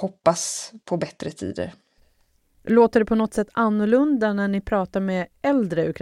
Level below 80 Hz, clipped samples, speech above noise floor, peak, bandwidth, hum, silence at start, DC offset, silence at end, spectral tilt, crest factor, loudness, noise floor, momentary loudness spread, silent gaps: -50 dBFS; under 0.1%; 42 dB; -4 dBFS; 13 kHz; none; 0 s; under 0.1%; 0 s; -5.5 dB/octave; 20 dB; -22 LUFS; -64 dBFS; 13 LU; none